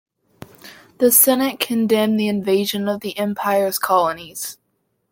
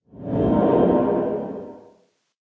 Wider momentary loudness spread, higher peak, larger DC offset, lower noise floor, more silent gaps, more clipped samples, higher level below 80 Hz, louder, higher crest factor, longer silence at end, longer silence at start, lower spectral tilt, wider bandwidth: second, 13 LU vs 17 LU; first, 0 dBFS vs -6 dBFS; neither; first, -70 dBFS vs -60 dBFS; neither; neither; second, -64 dBFS vs -44 dBFS; first, -17 LUFS vs -20 LUFS; about the same, 20 dB vs 16 dB; about the same, 0.6 s vs 0.6 s; first, 0.65 s vs 0.15 s; second, -3.5 dB/octave vs -11 dB/octave; first, 17 kHz vs 4.3 kHz